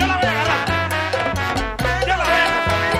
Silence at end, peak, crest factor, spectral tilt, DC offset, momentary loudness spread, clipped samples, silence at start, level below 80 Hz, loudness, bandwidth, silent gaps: 0 s; -4 dBFS; 14 dB; -4.5 dB/octave; under 0.1%; 5 LU; under 0.1%; 0 s; -32 dBFS; -18 LUFS; 16.5 kHz; none